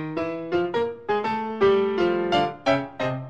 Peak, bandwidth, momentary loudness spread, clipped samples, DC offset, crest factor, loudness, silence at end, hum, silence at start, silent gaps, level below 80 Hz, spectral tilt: -8 dBFS; 8 kHz; 7 LU; under 0.1%; 0.2%; 16 dB; -24 LUFS; 0 s; none; 0 s; none; -58 dBFS; -6.5 dB/octave